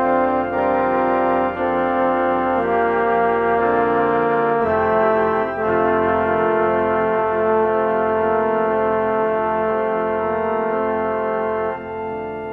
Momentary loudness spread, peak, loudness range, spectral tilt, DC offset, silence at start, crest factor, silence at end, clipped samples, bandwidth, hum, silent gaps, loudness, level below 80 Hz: 4 LU; -4 dBFS; 2 LU; -9 dB/octave; under 0.1%; 0 s; 14 dB; 0 s; under 0.1%; 4.8 kHz; none; none; -19 LUFS; -50 dBFS